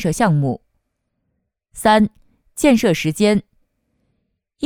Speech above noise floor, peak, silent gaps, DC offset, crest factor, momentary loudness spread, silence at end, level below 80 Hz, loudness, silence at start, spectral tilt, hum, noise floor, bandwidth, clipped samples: 57 dB; -2 dBFS; none; under 0.1%; 18 dB; 8 LU; 0 s; -46 dBFS; -17 LUFS; 0 s; -5.5 dB/octave; none; -73 dBFS; 18.5 kHz; under 0.1%